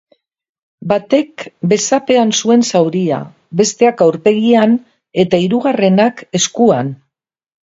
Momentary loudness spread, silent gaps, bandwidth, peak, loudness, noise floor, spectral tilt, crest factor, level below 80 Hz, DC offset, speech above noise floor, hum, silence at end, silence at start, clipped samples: 9 LU; none; 7.8 kHz; 0 dBFS; -13 LUFS; -75 dBFS; -5 dB/octave; 14 dB; -58 dBFS; under 0.1%; 63 dB; none; 0.8 s; 0.8 s; under 0.1%